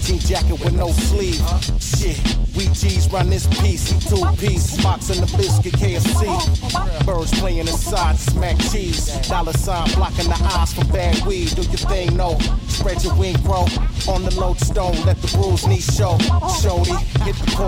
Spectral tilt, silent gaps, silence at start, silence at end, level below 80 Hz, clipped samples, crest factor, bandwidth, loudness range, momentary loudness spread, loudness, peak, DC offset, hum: -5 dB/octave; none; 0 s; 0 s; -20 dBFS; under 0.1%; 12 dB; 16.5 kHz; 2 LU; 3 LU; -19 LUFS; -4 dBFS; under 0.1%; none